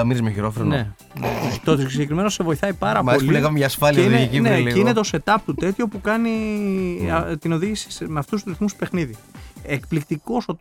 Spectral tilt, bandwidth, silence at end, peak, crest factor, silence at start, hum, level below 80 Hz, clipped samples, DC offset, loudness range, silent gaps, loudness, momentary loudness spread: -6 dB/octave; 19.5 kHz; 0.05 s; 0 dBFS; 20 dB; 0 s; none; -42 dBFS; under 0.1%; under 0.1%; 7 LU; none; -21 LUFS; 10 LU